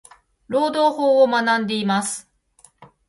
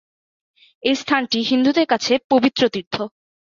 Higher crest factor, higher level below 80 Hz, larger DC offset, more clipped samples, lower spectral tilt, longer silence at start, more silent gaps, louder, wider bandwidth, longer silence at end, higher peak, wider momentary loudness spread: about the same, 16 dB vs 18 dB; about the same, -64 dBFS vs -62 dBFS; neither; neither; about the same, -4 dB/octave vs -4 dB/octave; second, 0.5 s vs 0.85 s; second, none vs 2.24-2.30 s, 2.87-2.91 s; about the same, -19 LUFS vs -19 LUFS; first, 11.5 kHz vs 7.4 kHz; second, 0.25 s vs 0.5 s; second, -6 dBFS vs -2 dBFS; about the same, 10 LU vs 10 LU